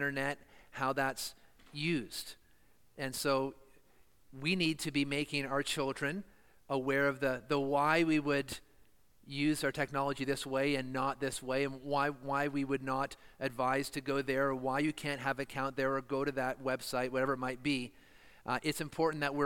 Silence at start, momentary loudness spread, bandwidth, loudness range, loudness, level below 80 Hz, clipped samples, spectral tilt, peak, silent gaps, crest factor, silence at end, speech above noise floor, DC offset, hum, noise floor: 0 s; 9 LU; 17 kHz; 4 LU; -35 LUFS; -64 dBFS; under 0.1%; -4.5 dB/octave; -16 dBFS; none; 20 dB; 0 s; 34 dB; under 0.1%; none; -69 dBFS